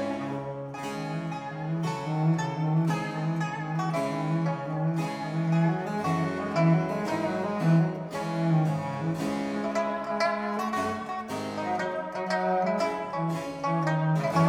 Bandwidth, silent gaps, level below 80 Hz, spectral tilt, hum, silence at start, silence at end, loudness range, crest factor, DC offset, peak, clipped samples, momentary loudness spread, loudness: 11.5 kHz; none; -64 dBFS; -7 dB/octave; none; 0 s; 0 s; 3 LU; 16 dB; under 0.1%; -12 dBFS; under 0.1%; 8 LU; -29 LUFS